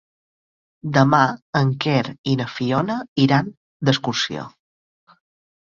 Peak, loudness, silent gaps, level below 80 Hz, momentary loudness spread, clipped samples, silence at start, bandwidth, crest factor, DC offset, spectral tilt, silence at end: -2 dBFS; -20 LUFS; 1.42-1.53 s, 2.18-2.24 s, 3.08-3.16 s, 3.57-3.80 s; -58 dBFS; 10 LU; under 0.1%; 0.85 s; 7.4 kHz; 20 dB; under 0.1%; -6 dB/octave; 1.3 s